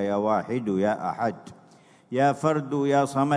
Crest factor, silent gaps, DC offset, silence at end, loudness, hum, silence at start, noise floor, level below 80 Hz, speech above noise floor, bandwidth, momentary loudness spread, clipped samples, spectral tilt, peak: 16 dB; none; under 0.1%; 0 s; -25 LUFS; none; 0 s; -55 dBFS; -70 dBFS; 31 dB; 11 kHz; 7 LU; under 0.1%; -7 dB/octave; -8 dBFS